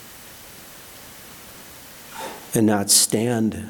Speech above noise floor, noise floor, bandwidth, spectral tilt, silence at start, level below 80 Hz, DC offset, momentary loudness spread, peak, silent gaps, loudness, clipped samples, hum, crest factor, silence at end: 23 dB; -42 dBFS; 19 kHz; -3 dB/octave; 0 s; -58 dBFS; under 0.1%; 25 LU; -2 dBFS; none; -18 LUFS; under 0.1%; none; 22 dB; 0 s